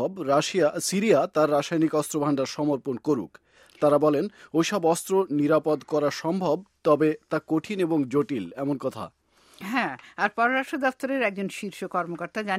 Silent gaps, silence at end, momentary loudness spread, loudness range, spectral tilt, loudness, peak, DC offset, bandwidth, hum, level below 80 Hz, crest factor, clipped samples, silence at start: none; 0 s; 9 LU; 3 LU; -5 dB/octave; -25 LUFS; -6 dBFS; under 0.1%; 16 kHz; none; -70 dBFS; 18 dB; under 0.1%; 0 s